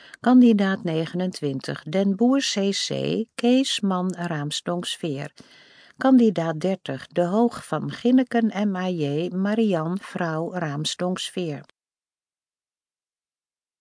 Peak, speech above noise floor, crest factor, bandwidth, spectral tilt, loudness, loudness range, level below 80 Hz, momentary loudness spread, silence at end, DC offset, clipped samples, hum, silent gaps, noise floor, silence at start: -6 dBFS; over 68 dB; 16 dB; 10.5 kHz; -5.5 dB/octave; -23 LUFS; 7 LU; -72 dBFS; 11 LU; 2.2 s; under 0.1%; under 0.1%; none; none; under -90 dBFS; 0.25 s